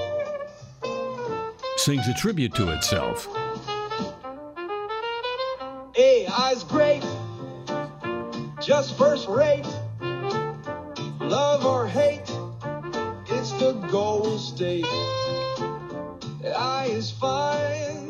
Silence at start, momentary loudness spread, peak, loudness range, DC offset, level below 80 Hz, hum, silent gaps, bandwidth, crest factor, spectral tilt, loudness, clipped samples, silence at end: 0 s; 13 LU; -6 dBFS; 3 LU; under 0.1%; -52 dBFS; none; none; 15.5 kHz; 18 dB; -4.5 dB/octave; -25 LUFS; under 0.1%; 0 s